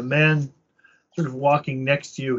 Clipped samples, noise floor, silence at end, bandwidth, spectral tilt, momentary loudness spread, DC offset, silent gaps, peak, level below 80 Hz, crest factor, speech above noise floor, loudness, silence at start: under 0.1%; -60 dBFS; 0 s; 8 kHz; -5 dB/octave; 13 LU; under 0.1%; none; -6 dBFS; -64 dBFS; 18 dB; 38 dB; -22 LUFS; 0 s